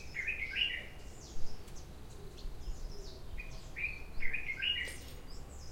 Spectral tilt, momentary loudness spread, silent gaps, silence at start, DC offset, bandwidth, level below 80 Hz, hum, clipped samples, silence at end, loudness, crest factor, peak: -2.5 dB/octave; 17 LU; none; 0 s; under 0.1%; 16 kHz; -46 dBFS; none; under 0.1%; 0 s; -38 LUFS; 20 dB; -18 dBFS